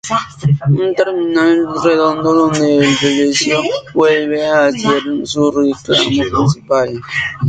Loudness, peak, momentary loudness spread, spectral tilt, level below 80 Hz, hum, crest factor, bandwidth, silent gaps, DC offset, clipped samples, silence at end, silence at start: -13 LUFS; 0 dBFS; 4 LU; -5 dB/octave; -46 dBFS; none; 12 dB; 9.2 kHz; none; under 0.1%; under 0.1%; 0 s; 0.05 s